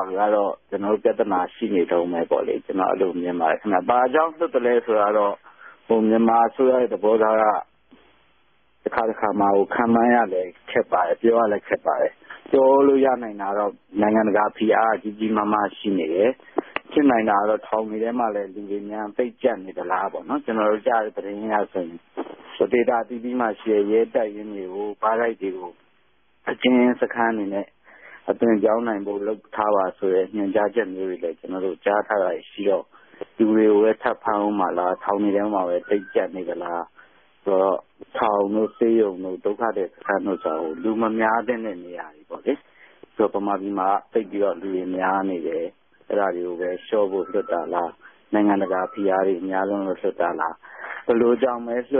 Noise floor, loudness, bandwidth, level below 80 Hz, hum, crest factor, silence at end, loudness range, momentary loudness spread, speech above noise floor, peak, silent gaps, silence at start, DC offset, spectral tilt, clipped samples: -65 dBFS; -22 LUFS; 4 kHz; -66 dBFS; none; 18 dB; 0 s; 5 LU; 11 LU; 43 dB; -4 dBFS; none; 0 s; under 0.1%; -10.5 dB/octave; under 0.1%